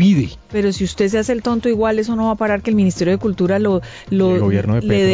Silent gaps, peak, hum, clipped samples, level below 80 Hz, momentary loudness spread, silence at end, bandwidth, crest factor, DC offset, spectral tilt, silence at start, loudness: none; -2 dBFS; none; under 0.1%; -38 dBFS; 4 LU; 0 s; 7.8 kHz; 12 dB; under 0.1%; -7 dB/octave; 0 s; -17 LUFS